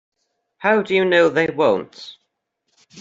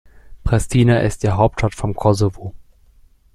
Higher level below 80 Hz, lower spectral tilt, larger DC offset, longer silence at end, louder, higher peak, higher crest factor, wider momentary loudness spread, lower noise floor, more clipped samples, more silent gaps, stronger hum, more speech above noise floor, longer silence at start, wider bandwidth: second, -64 dBFS vs -32 dBFS; second, -5.5 dB/octave vs -7 dB/octave; neither; second, 0 s vs 0.75 s; about the same, -18 LUFS vs -18 LUFS; about the same, -2 dBFS vs -2 dBFS; about the same, 18 dB vs 16 dB; first, 21 LU vs 12 LU; first, -74 dBFS vs -50 dBFS; neither; neither; neither; first, 57 dB vs 34 dB; first, 0.6 s vs 0.3 s; second, 7.8 kHz vs 12.5 kHz